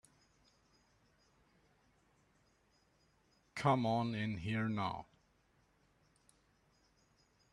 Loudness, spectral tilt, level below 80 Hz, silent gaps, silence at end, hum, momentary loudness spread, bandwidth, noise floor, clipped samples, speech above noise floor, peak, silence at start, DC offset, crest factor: -37 LUFS; -7 dB/octave; -72 dBFS; none; 2.5 s; none; 11 LU; 12 kHz; -74 dBFS; under 0.1%; 38 dB; -16 dBFS; 3.55 s; under 0.1%; 26 dB